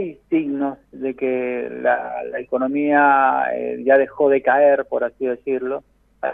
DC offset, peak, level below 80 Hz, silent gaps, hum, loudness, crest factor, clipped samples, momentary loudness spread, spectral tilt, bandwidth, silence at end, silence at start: under 0.1%; -4 dBFS; -60 dBFS; none; none; -19 LUFS; 16 dB; under 0.1%; 13 LU; -9 dB/octave; 3.8 kHz; 0 s; 0 s